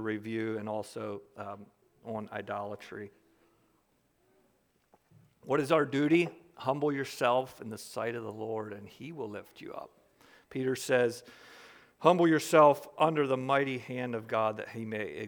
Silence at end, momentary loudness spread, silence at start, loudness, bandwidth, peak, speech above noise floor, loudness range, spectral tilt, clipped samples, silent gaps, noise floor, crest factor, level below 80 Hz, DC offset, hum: 0 s; 20 LU; 0 s; -31 LUFS; over 20 kHz; -6 dBFS; 41 dB; 16 LU; -5.5 dB/octave; under 0.1%; none; -72 dBFS; 26 dB; -78 dBFS; under 0.1%; none